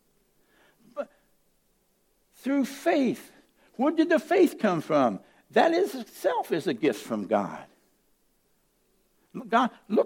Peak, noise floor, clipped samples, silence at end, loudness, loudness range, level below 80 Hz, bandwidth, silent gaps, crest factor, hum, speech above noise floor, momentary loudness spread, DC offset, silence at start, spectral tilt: -8 dBFS; -69 dBFS; under 0.1%; 0 s; -26 LUFS; 7 LU; -76 dBFS; 17 kHz; none; 20 dB; none; 44 dB; 17 LU; under 0.1%; 0.95 s; -5.5 dB/octave